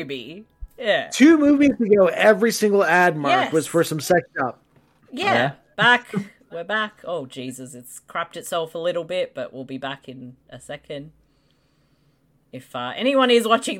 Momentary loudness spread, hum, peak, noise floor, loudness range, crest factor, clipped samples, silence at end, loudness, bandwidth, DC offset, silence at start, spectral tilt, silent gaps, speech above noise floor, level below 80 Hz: 21 LU; none; -4 dBFS; -63 dBFS; 15 LU; 18 dB; under 0.1%; 0 s; -20 LUFS; 16.5 kHz; under 0.1%; 0 s; -4.5 dB/octave; none; 42 dB; -56 dBFS